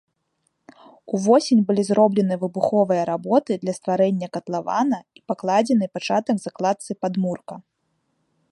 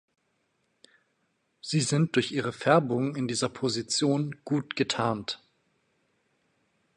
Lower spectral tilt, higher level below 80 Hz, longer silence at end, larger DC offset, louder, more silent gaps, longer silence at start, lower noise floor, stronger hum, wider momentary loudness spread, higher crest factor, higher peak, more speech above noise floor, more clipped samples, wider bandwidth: first, -6.5 dB/octave vs -4.5 dB/octave; about the same, -72 dBFS vs -68 dBFS; second, 0.9 s vs 1.6 s; neither; first, -21 LUFS vs -28 LUFS; neither; second, 1.1 s vs 1.65 s; about the same, -72 dBFS vs -74 dBFS; neither; about the same, 10 LU vs 8 LU; about the same, 18 dB vs 22 dB; first, -4 dBFS vs -8 dBFS; first, 51 dB vs 47 dB; neither; about the same, 11.5 kHz vs 11 kHz